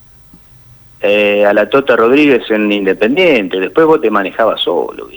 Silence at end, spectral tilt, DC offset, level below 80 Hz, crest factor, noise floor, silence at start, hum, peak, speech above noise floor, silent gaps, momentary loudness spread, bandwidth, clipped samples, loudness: 0 s; -6 dB/octave; under 0.1%; -50 dBFS; 12 dB; -41 dBFS; 1 s; none; 0 dBFS; 30 dB; none; 5 LU; over 20 kHz; under 0.1%; -11 LUFS